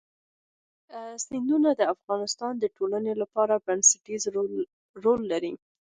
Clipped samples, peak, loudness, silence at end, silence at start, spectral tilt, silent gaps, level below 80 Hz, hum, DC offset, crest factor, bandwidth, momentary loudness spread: under 0.1%; -6 dBFS; -26 LUFS; 0.35 s; 0.9 s; -2.5 dB/octave; 2.04-2.08 s, 4.73-4.94 s; -70 dBFS; none; under 0.1%; 22 dB; 10 kHz; 16 LU